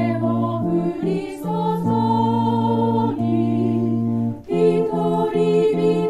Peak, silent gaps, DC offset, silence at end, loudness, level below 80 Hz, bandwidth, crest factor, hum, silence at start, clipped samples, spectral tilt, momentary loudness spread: -6 dBFS; none; under 0.1%; 0 s; -20 LUFS; -52 dBFS; 12.5 kHz; 12 dB; none; 0 s; under 0.1%; -9 dB/octave; 6 LU